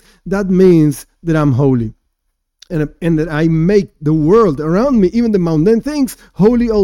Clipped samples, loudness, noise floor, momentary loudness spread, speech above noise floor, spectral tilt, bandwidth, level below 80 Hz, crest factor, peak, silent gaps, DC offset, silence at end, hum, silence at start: under 0.1%; -13 LUFS; -69 dBFS; 10 LU; 57 dB; -8 dB/octave; 16.5 kHz; -34 dBFS; 12 dB; 0 dBFS; none; under 0.1%; 0 s; none; 0.25 s